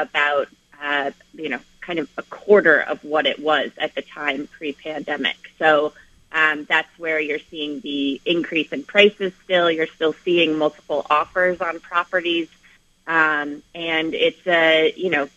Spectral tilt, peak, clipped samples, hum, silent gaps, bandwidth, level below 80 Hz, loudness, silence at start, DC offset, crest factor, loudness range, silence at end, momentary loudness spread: -4.5 dB/octave; 0 dBFS; under 0.1%; none; none; 8.4 kHz; -62 dBFS; -20 LUFS; 0 s; under 0.1%; 20 dB; 3 LU; 0.1 s; 13 LU